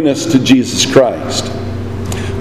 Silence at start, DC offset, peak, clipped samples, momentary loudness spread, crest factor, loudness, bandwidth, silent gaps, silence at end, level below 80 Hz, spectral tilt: 0 s; under 0.1%; 0 dBFS; 0.4%; 12 LU; 14 dB; -13 LUFS; 14 kHz; none; 0 s; -36 dBFS; -4.5 dB/octave